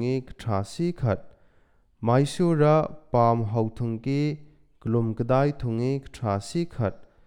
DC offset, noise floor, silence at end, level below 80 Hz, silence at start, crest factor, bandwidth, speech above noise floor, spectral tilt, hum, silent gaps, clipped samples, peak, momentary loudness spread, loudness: under 0.1%; -61 dBFS; 0.2 s; -50 dBFS; 0 s; 18 dB; 11.5 kHz; 36 dB; -7.5 dB/octave; none; none; under 0.1%; -8 dBFS; 9 LU; -26 LUFS